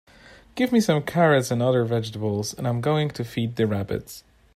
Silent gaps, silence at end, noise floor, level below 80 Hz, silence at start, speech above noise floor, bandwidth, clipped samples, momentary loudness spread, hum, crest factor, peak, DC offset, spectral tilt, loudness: none; 0.35 s; -50 dBFS; -56 dBFS; 0.55 s; 27 dB; 15 kHz; under 0.1%; 12 LU; none; 18 dB; -6 dBFS; under 0.1%; -6 dB/octave; -23 LUFS